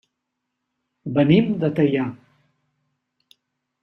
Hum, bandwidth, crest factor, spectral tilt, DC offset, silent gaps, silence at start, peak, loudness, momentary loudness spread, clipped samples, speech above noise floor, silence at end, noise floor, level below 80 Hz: none; 5.8 kHz; 20 dB; -9.5 dB/octave; under 0.1%; none; 1.05 s; -4 dBFS; -20 LUFS; 12 LU; under 0.1%; 61 dB; 1.65 s; -79 dBFS; -60 dBFS